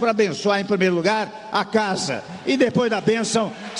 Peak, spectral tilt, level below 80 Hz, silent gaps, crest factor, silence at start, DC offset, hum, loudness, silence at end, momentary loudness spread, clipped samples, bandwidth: -6 dBFS; -4.5 dB/octave; -62 dBFS; none; 14 dB; 0 s; under 0.1%; none; -21 LUFS; 0 s; 6 LU; under 0.1%; 11 kHz